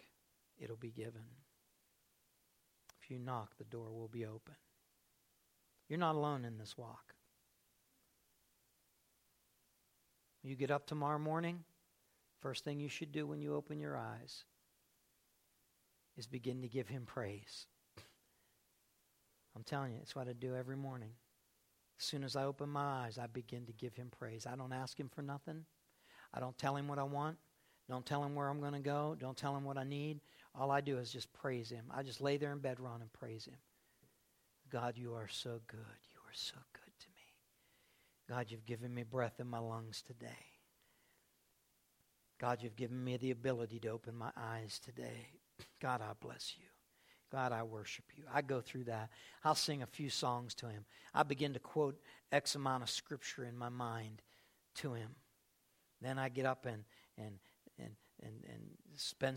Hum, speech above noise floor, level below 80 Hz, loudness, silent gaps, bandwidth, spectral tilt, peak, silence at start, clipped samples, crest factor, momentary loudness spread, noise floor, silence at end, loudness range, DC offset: none; 35 dB; -80 dBFS; -44 LUFS; none; 16.5 kHz; -5 dB/octave; -18 dBFS; 0 s; under 0.1%; 28 dB; 17 LU; -78 dBFS; 0 s; 10 LU; under 0.1%